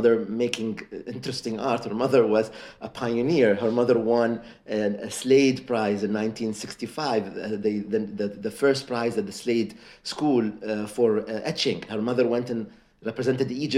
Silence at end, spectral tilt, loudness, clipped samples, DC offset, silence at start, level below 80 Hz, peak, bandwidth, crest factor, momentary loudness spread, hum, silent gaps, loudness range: 0 s; -5.5 dB/octave; -25 LUFS; under 0.1%; under 0.1%; 0 s; -62 dBFS; -6 dBFS; 14.5 kHz; 18 dB; 13 LU; none; none; 4 LU